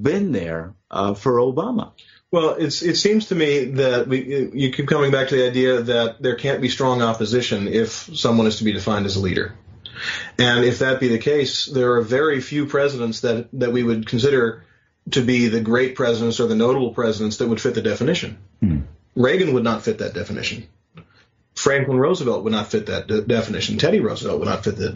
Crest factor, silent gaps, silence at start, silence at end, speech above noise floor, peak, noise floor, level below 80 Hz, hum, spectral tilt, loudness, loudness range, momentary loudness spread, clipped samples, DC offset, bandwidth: 18 dB; none; 0 s; 0 s; 38 dB; -2 dBFS; -57 dBFS; -48 dBFS; none; -4.5 dB/octave; -20 LUFS; 3 LU; 8 LU; under 0.1%; under 0.1%; 7.6 kHz